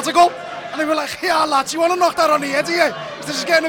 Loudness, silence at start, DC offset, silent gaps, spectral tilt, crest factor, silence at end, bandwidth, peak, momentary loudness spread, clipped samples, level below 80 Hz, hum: -17 LUFS; 0 s; under 0.1%; none; -2.5 dB/octave; 14 dB; 0 s; 19 kHz; -2 dBFS; 9 LU; under 0.1%; -58 dBFS; none